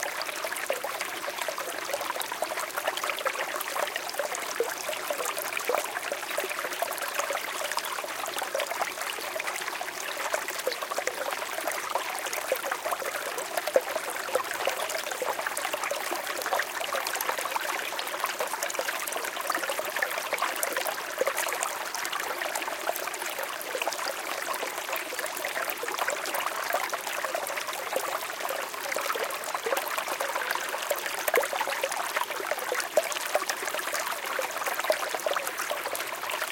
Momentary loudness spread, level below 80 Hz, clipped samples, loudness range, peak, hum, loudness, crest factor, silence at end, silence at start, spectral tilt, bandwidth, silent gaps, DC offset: 4 LU; -76 dBFS; under 0.1%; 2 LU; -6 dBFS; none; -30 LUFS; 26 dB; 0 s; 0 s; 0.5 dB/octave; 17 kHz; none; under 0.1%